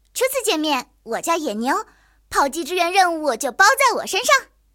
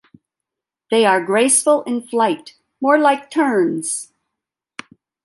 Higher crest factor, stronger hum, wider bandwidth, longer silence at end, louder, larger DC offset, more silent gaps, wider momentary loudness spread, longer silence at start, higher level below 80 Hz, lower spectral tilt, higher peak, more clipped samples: about the same, 18 dB vs 16 dB; neither; first, 17 kHz vs 12 kHz; second, 0.3 s vs 1.2 s; about the same, -19 LUFS vs -17 LUFS; neither; neither; second, 9 LU vs 18 LU; second, 0.15 s vs 0.9 s; first, -56 dBFS vs -72 dBFS; second, -1 dB/octave vs -3 dB/octave; about the same, -2 dBFS vs -2 dBFS; neither